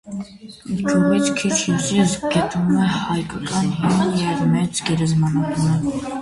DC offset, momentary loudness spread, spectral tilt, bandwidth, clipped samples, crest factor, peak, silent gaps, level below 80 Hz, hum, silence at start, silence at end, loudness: under 0.1%; 7 LU; -5.5 dB/octave; 11.5 kHz; under 0.1%; 14 dB; -4 dBFS; none; -48 dBFS; none; 0.05 s; 0 s; -19 LUFS